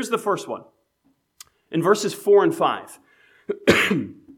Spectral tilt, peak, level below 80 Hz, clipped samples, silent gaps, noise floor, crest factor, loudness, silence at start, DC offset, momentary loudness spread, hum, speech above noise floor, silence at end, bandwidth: -4.5 dB/octave; -2 dBFS; -58 dBFS; under 0.1%; none; -67 dBFS; 22 dB; -21 LUFS; 0 s; under 0.1%; 16 LU; none; 46 dB; 0.25 s; 17 kHz